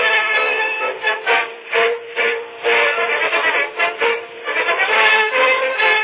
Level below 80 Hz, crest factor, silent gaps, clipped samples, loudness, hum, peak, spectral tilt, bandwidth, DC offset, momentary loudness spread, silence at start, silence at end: -76 dBFS; 16 dB; none; under 0.1%; -16 LUFS; none; -2 dBFS; -4 dB/octave; 4 kHz; under 0.1%; 6 LU; 0 s; 0 s